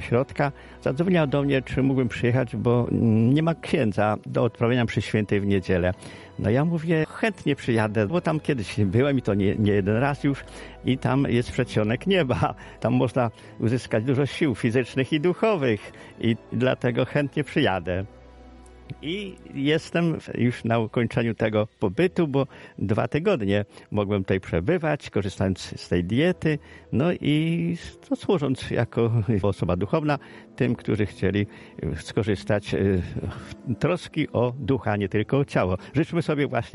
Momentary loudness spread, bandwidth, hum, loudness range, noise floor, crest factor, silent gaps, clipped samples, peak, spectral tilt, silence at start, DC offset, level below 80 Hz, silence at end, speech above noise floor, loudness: 8 LU; 11.5 kHz; none; 4 LU; -46 dBFS; 16 dB; none; under 0.1%; -8 dBFS; -7.5 dB/octave; 0 s; under 0.1%; -50 dBFS; 0.05 s; 23 dB; -24 LUFS